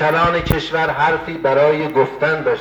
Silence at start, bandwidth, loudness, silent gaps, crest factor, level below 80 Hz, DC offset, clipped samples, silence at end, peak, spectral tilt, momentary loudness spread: 0 s; over 20 kHz; -17 LUFS; none; 16 dB; -36 dBFS; under 0.1%; under 0.1%; 0 s; 0 dBFS; -6.5 dB/octave; 4 LU